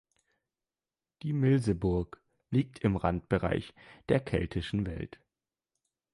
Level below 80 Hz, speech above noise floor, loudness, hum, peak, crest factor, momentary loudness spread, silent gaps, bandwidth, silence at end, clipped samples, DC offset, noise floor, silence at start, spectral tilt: -48 dBFS; over 60 dB; -31 LUFS; none; -12 dBFS; 20 dB; 15 LU; none; 11.5 kHz; 1.05 s; under 0.1%; under 0.1%; under -90 dBFS; 1.25 s; -8 dB/octave